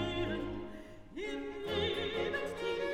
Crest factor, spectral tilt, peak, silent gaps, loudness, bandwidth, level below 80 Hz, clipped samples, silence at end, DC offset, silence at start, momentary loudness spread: 14 dB; -5.5 dB/octave; -22 dBFS; none; -37 LUFS; 15.5 kHz; -54 dBFS; under 0.1%; 0 s; under 0.1%; 0 s; 12 LU